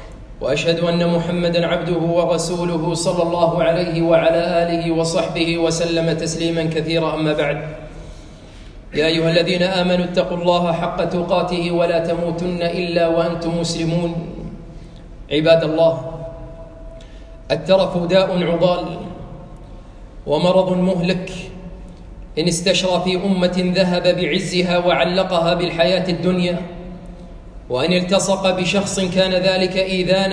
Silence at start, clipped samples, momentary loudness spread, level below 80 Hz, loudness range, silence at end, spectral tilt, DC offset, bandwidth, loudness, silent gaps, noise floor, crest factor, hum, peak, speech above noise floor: 0 s; under 0.1%; 18 LU; -40 dBFS; 4 LU; 0 s; -5 dB/octave; under 0.1%; 10.5 kHz; -18 LUFS; none; -38 dBFS; 16 dB; none; -2 dBFS; 20 dB